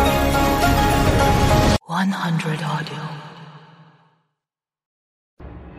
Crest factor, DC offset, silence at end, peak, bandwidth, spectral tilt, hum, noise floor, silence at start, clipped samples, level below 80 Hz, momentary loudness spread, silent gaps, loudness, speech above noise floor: 16 dB; under 0.1%; 0 s; -4 dBFS; 15.5 kHz; -5.5 dB/octave; none; -88 dBFS; 0 s; under 0.1%; -28 dBFS; 16 LU; 4.86-5.37 s; -19 LUFS; 65 dB